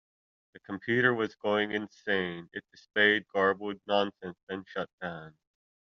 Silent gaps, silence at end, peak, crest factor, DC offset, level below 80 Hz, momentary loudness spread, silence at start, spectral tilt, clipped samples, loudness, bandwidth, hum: 4.43-4.47 s, 4.93-4.98 s; 0.55 s; -10 dBFS; 22 dB; under 0.1%; -72 dBFS; 17 LU; 0.55 s; -2.5 dB/octave; under 0.1%; -30 LUFS; 7 kHz; none